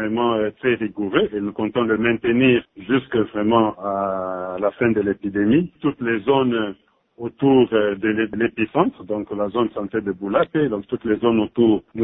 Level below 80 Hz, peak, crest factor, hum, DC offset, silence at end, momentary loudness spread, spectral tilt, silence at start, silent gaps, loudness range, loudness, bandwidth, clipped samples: -54 dBFS; -2 dBFS; 18 dB; none; under 0.1%; 0 s; 7 LU; -11 dB/octave; 0 s; none; 2 LU; -20 LUFS; 3.9 kHz; under 0.1%